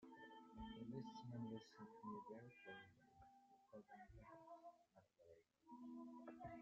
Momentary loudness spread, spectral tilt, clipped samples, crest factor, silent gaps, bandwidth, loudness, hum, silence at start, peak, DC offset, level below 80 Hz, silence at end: 10 LU; -5.5 dB/octave; under 0.1%; 18 dB; none; 7.4 kHz; -59 LUFS; none; 0 s; -40 dBFS; under 0.1%; -78 dBFS; 0 s